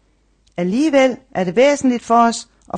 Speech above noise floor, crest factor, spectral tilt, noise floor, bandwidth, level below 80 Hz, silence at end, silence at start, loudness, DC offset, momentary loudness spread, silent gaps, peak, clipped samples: 42 dB; 14 dB; -5 dB/octave; -58 dBFS; 9.8 kHz; -56 dBFS; 0 s; 0.6 s; -16 LUFS; under 0.1%; 10 LU; none; -2 dBFS; under 0.1%